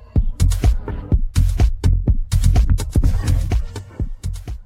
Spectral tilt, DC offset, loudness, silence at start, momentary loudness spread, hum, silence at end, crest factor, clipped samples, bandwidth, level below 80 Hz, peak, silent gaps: -6.5 dB/octave; under 0.1%; -20 LUFS; 0 s; 11 LU; none; 0 s; 14 dB; under 0.1%; 15 kHz; -18 dBFS; -2 dBFS; none